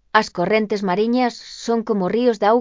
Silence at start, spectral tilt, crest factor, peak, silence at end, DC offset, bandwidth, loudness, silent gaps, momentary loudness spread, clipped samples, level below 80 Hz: 0.15 s; -5.5 dB/octave; 18 dB; 0 dBFS; 0 s; under 0.1%; 7.6 kHz; -19 LUFS; none; 5 LU; under 0.1%; -58 dBFS